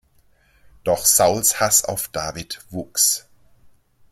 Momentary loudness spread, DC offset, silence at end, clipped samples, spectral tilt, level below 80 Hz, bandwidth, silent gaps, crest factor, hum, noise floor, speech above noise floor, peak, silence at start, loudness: 15 LU; under 0.1%; 0.95 s; under 0.1%; -1.5 dB/octave; -52 dBFS; 16.5 kHz; none; 20 dB; none; -58 dBFS; 38 dB; -2 dBFS; 0.85 s; -18 LUFS